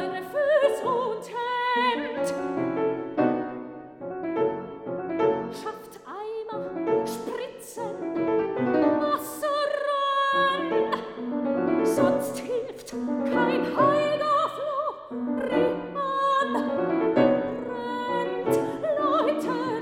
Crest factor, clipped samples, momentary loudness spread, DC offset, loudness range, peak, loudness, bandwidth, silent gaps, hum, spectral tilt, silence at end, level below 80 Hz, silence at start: 18 dB; under 0.1%; 12 LU; under 0.1%; 5 LU; -8 dBFS; -26 LUFS; 18.5 kHz; none; none; -5.5 dB/octave; 0 s; -64 dBFS; 0 s